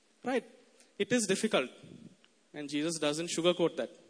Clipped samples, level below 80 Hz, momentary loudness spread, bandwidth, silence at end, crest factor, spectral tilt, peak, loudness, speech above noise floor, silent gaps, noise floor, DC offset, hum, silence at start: under 0.1%; -80 dBFS; 16 LU; 11 kHz; 0.15 s; 20 dB; -3.5 dB/octave; -14 dBFS; -32 LUFS; 27 dB; none; -59 dBFS; under 0.1%; none; 0.25 s